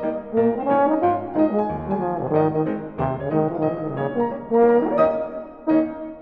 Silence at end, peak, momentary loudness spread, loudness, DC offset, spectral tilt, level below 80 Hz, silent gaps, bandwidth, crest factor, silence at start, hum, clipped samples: 0 s; -4 dBFS; 8 LU; -21 LUFS; under 0.1%; -11 dB/octave; -52 dBFS; none; 4.8 kHz; 16 dB; 0 s; none; under 0.1%